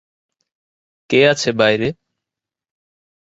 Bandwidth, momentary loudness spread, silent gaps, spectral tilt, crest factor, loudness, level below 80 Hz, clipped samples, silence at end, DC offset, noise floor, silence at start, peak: 8 kHz; 7 LU; none; -4.5 dB/octave; 20 dB; -16 LUFS; -56 dBFS; under 0.1%; 1.35 s; under 0.1%; -86 dBFS; 1.1 s; 0 dBFS